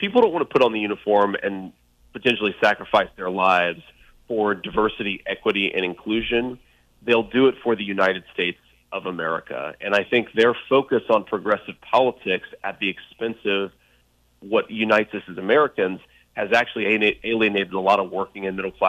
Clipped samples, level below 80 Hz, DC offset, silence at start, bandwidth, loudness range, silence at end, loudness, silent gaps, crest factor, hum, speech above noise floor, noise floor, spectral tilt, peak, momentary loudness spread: under 0.1%; -54 dBFS; under 0.1%; 0 s; 9.4 kHz; 3 LU; 0 s; -22 LUFS; none; 18 dB; none; 39 dB; -61 dBFS; -5.5 dB/octave; -4 dBFS; 11 LU